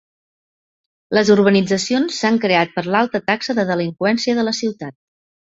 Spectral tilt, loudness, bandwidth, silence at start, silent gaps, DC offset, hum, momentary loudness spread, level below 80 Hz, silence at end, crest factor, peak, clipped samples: -5 dB/octave; -17 LUFS; 8 kHz; 1.1 s; none; under 0.1%; none; 7 LU; -58 dBFS; 0.7 s; 16 dB; -2 dBFS; under 0.1%